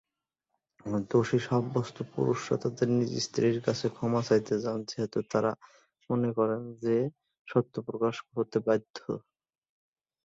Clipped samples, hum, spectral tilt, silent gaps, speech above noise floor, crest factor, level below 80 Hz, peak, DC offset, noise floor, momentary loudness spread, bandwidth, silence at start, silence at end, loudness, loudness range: under 0.1%; none; -6.5 dB/octave; 7.39-7.45 s, 8.90-8.94 s; 58 dB; 20 dB; -68 dBFS; -12 dBFS; under 0.1%; -88 dBFS; 9 LU; 8 kHz; 0.85 s; 1.05 s; -30 LUFS; 3 LU